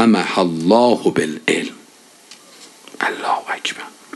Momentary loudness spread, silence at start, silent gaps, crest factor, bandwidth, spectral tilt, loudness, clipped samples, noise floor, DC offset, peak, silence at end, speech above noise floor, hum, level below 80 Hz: 17 LU; 0 s; none; 18 dB; 12.5 kHz; -4.5 dB/octave; -18 LUFS; under 0.1%; -47 dBFS; under 0.1%; 0 dBFS; 0.25 s; 30 dB; none; -64 dBFS